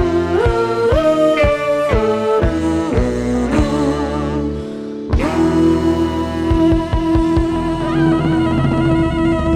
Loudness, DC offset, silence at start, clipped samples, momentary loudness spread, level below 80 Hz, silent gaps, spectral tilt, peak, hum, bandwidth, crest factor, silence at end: -16 LUFS; under 0.1%; 0 s; under 0.1%; 6 LU; -26 dBFS; none; -7.5 dB/octave; 0 dBFS; none; 11 kHz; 14 dB; 0 s